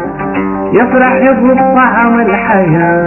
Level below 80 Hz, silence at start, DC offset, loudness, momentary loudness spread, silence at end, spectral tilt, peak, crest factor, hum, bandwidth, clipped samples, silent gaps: -38 dBFS; 0 s; under 0.1%; -9 LUFS; 7 LU; 0 s; -10 dB/octave; 0 dBFS; 8 dB; none; 3 kHz; under 0.1%; none